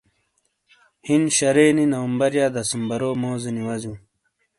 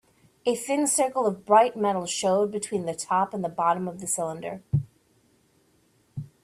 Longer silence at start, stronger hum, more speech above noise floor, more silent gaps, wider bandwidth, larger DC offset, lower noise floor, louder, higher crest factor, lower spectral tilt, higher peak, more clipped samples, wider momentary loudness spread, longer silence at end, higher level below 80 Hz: first, 1.05 s vs 0.45 s; neither; first, 50 dB vs 40 dB; neither; second, 11.5 kHz vs 15 kHz; neither; first, -71 dBFS vs -64 dBFS; first, -21 LUFS vs -25 LUFS; about the same, 18 dB vs 20 dB; about the same, -4.5 dB/octave vs -4.5 dB/octave; about the same, -4 dBFS vs -6 dBFS; neither; about the same, 14 LU vs 12 LU; first, 0.6 s vs 0.2 s; about the same, -60 dBFS vs -62 dBFS